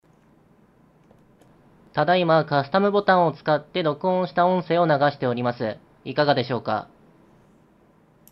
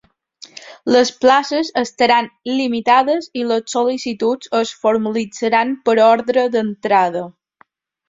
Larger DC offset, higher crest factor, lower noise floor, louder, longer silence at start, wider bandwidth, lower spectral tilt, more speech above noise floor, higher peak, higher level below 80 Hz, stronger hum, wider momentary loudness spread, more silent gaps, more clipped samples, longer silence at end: neither; about the same, 20 dB vs 16 dB; about the same, -57 dBFS vs -55 dBFS; second, -22 LUFS vs -16 LUFS; first, 1.95 s vs 0.6 s; first, 12.5 kHz vs 7.8 kHz; first, -8.5 dB/octave vs -4 dB/octave; about the same, 36 dB vs 39 dB; about the same, -4 dBFS vs -2 dBFS; about the same, -64 dBFS vs -62 dBFS; neither; about the same, 10 LU vs 9 LU; neither; neither; first, 1.5 s vs 0.8 s